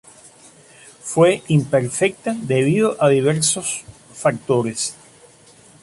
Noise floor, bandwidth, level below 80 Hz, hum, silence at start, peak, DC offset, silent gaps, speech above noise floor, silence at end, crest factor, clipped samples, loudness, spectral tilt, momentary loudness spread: -48 dBFS; 11.5 kHz; -58 dBFS; none; 1.05 s; -2 dBFS; under 0.1%; none; 30 dB; 0.9 s; 16 dB; under 0.1%; -19 LUFS; -5 dB/octave; 10 LU